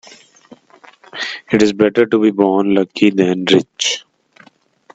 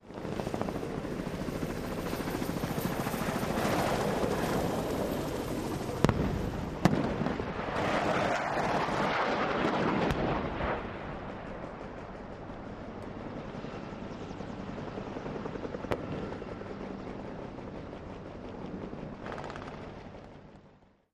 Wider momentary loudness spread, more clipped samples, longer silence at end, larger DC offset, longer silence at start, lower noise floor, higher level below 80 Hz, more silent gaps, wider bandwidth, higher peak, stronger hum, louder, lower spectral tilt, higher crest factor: second, 11 LU vs 14 LU; neither; first, 0.95 s vs 0.4 s; neither; first, 1.15 s vs 0.05 s; second, -49 dBFS vs -60 dBFS; second, -56 dBFS vs -48 dBFS; neither; second, 8.4 kHz vs 15.5 kHz; first, 0 dBFS vs -4 dBFS; neither; first, -15 LUFS vs -34 LUFS; second, -4.5 dB/octave vs -6 dB/octave; second, 16 dB vs 30 dB